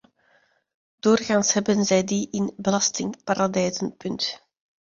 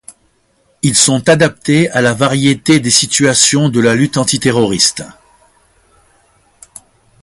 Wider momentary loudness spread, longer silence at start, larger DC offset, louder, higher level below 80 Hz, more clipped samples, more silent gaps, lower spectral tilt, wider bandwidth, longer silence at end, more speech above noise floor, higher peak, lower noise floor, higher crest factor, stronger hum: first, 9 LU vs 4 LU; first, 1.05 s vs 0.85 s; neither; second, -23 LUFS vs -11 LUFS; second, -62 dBFS vs -48 dBFS; neither; neither; about the same, -4 dB/octave vs -3.5 dB/octave; second, 7.6 kHz vs 16 kHz; second, 0.5 s vs 2.15 s; second, 41 dB vs 45 dB; second, -6 dBFS vs 0 dBFS; first, -63 dBFS vs -57 dBFS; about the same, 18 dB vs 14 dB; neither